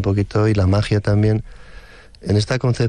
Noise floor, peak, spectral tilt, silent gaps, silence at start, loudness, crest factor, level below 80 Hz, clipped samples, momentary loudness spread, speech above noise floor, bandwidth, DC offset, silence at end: -40 dBFS; -6 dBFS; -7 dB/octave; none; 0 s; -18 LUFS; 10 dB; -38 dBFS; under 0.1%; 4 LU; 24 dB; 10 kHz; under 0.1%; 0 s